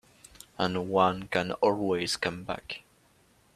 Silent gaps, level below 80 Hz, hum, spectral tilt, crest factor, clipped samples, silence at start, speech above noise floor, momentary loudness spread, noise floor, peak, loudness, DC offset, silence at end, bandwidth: none; -62 dBFS; none; -4.5 dB/octave; 22 dB; under 0.1%; 0.6 s; 35 dB; 13 LU; -64 dBFS; -8 dBFS; -29 LUFS; under 0.1%; 0.75 s; 14.5 kHz